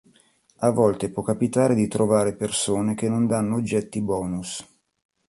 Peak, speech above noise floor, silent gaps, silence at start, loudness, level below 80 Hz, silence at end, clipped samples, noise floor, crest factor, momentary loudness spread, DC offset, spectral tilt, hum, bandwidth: -6 dBFS; 38 dB; none; 0.6 s; -23 LUFS; -54 dBFS; 0.65 s; under 0.1%; -60 dBFS; 18 dB; 7 LU; under 0.1%; -5.5 dB/octave; none; 11.5 kHz